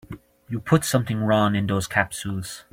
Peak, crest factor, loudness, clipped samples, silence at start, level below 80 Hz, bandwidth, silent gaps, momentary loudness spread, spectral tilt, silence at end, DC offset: -4 dBFS; 20 dB; -23 LUFS; under 0.1%; 0.1 s; -52 dBFS; 16.5 kHz; none; 13 LU; -5.5 dB/octave; 0.1 s; under 0.1%